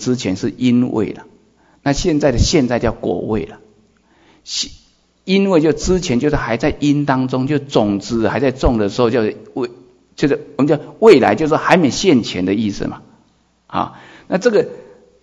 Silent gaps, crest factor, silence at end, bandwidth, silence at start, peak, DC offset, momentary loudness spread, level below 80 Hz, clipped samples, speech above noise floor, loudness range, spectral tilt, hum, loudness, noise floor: none; 16 dB; 0.4 s; 8.6 kHz; 0 s; 0 dBFS; under 0.1%; 12 LU; -32 dBFS; 0.1%; 41 dB; 5 LU; -5.5 dB/octave; none; -16 LUFS; -56 dBFS